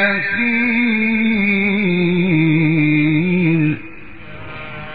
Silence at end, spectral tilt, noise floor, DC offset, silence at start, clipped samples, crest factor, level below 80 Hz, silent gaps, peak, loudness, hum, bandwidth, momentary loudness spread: 0 s; -5.5 dB/octave; -36 dBFS; 2%; 0 s; under 0.1%; 14 dB; -50 dBFS; none; -2 dBFS; -15 LUFS; none; 4.9 kHz; 16 LU